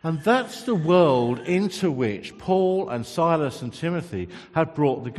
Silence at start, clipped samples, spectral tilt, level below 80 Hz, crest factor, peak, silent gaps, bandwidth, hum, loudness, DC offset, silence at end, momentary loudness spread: 0.05 s; under 0.1%; -6.5 dB/octave; -60 dBFS; 18 dB; -4 dBFS; none; 13 kHz; none; -23 LUFS; under 0.1%; 0 s; 10 LU